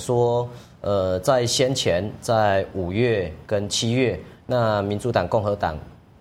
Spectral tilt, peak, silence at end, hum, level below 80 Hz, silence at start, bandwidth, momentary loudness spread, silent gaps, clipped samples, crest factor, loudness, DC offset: -5 dB/octave; -4 dBFS; 0.3 s; none; -48 dBFS; 0 s; 16 kHz; 7 LU; none; under 0.1%; 18 dB; -22 LUFS; under 0.1%